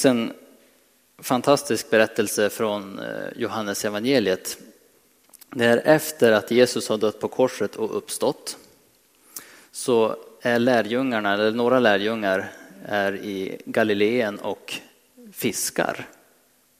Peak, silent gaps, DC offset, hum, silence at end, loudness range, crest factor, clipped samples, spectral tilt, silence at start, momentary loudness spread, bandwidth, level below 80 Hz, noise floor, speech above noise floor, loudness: -2 dBFS; none; under 0.1%; none; 0.7 s; 5 LU; 20 dB; under 0.1%; -4 dB/octave; 0 s; 16 LU; 16 kHz; -70 dBFS; -60 dBFS; 38 dB; -23 LUFS